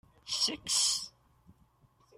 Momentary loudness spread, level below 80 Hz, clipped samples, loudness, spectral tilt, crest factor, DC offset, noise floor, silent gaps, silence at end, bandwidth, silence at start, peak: 10 LU; -68 dBFS; under 0.1%; -30 LUFS; 1 dB/octave; 20 dB; under 0.1%; -67 dBFS; none; 1.1 s; 16 kHz; 0.25 s; -16 dBFS